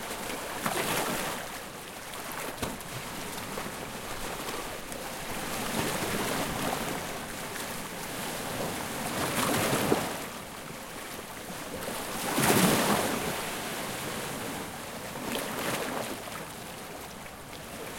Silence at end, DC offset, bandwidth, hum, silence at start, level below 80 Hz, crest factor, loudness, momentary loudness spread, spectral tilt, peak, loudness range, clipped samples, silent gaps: 0 s; under 0.1%; 17 kHz; none; 0 s; -54 dBFS; 24 dB; -32 LUFS; 13 LU; -3 dB/octave; -10 dBFS; 7 LU; under 0.1%; none